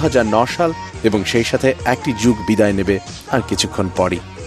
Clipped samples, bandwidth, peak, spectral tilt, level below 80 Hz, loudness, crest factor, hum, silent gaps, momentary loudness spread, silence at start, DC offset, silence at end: under 0.1%; 14 kHz; 0 dBFS; -5 dB/octave; -38 dBFS; -17 LUFS; 16 dB; none; none; 5 LU; 0 s; under 0.1%; 0 s